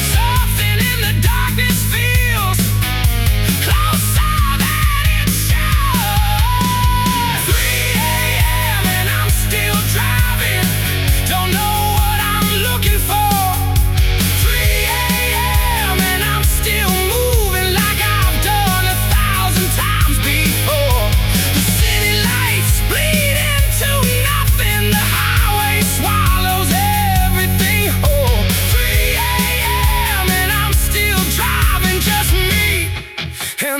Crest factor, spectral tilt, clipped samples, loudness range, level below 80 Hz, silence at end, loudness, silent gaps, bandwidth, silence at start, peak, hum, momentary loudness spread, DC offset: 14 dB; -3.5 dB/octave; under 0.1%; 1 LU; -20 dBFS; 0 s; -14 LUFS; none; 18 kHz; 0 s; 0 dBFS; none; 1 LU; 0.1%